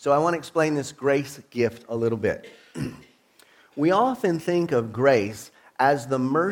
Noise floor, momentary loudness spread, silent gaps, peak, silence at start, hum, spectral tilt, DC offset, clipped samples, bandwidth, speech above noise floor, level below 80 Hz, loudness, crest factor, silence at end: -57 dBFS; 14 LU; none; -6 dBFS; 0 s; none; -6 dB/octave; under 0.1%; under 0.1%; 17.5 kHz; 34 dB; -60 dBFS; -24 LUFS; 18 dB; 0 s